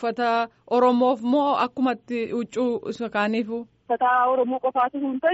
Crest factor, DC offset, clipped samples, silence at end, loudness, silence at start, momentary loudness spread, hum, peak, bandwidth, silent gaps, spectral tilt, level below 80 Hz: 14 dB; under 0.1%; under 0.1%; 0 s; -23 LUFS; 0 s; 8 LU; none; -8 dBFS; 8 kHz; none; -3 dB/octave; -70 dBFS